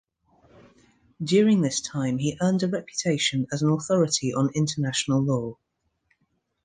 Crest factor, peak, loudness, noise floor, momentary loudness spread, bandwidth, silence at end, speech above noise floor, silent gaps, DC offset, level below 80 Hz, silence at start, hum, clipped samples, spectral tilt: 16 dB; -8 dBFS; -24 LUFS; -73 dBFS; 6 LU; 9.8 kHz; 1.1 s; 49 dB; none; under 0.1%; -62 dBFS; 1.2 s; none; under 0.1%; -5 dB/octave